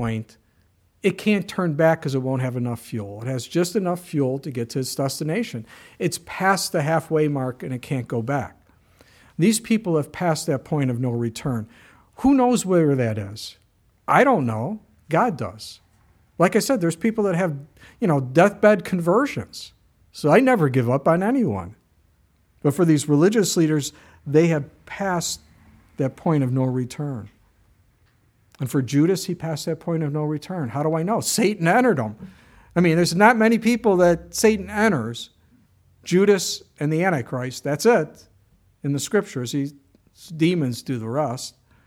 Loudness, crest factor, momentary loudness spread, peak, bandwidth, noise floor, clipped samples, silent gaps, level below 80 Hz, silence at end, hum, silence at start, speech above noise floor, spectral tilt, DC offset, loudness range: -22 LUFS; 22 dB; 14 LU; 0 dBFS; 17 kHz; -61 dBFS; under 0.1%; none; -56 dBFS; 0.35 s; none; 0 s; 40 dB; -5.5 dB/octave; under 0.1%; 6 LU